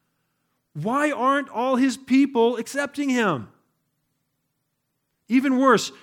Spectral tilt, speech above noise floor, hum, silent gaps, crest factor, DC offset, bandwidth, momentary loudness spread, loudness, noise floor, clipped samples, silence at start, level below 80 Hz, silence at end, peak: -5 dB/octave; 55 dB; none; none; 18 dB; under 0.1%; 15.5 kHz; 9 LU; -22 LUFS; -76 dBFS; under 0.1%; 0.75 s; -76 dBFS; 0.15 s; -6 dBFS